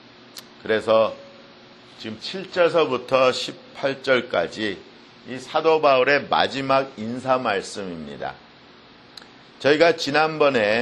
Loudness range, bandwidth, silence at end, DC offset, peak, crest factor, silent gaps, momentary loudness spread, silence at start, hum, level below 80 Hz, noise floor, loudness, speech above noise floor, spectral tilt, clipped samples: 3 LU; 12 kHz; 0 s; under 0.1%; 0 dBFS; 22 dB; none; 18 LU; 0.35 s; none; -62 dBFS; -48 dBFS; -21 LUFS; 27 dB; -4.5 dB/octave; under 0.1%